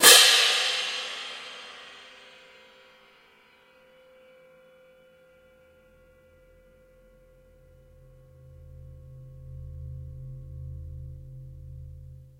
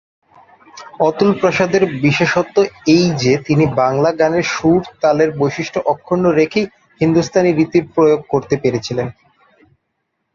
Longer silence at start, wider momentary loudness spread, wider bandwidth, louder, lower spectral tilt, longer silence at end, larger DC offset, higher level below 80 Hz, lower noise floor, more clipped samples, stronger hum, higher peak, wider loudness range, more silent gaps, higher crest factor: second, 0 s vs 0.75 s; first, 29 LU vs 5 LU; first, 16 kHz vs 7.4 kHz; second, -19 LUFS vs -15 LUFS; second, 0 dB/octave vs -6 dB/octave; second, 0.5 s vs 1.25 s; neither; about the same, -50 dBFS vs -50 dBFS; second, -58 dBFS vs -71 dBFS; neither; neither; about the same, -2 dBFS vs -2 dBFS; first, 27 LU vs 2 LU; neither; first, 28 dB vs 14 dB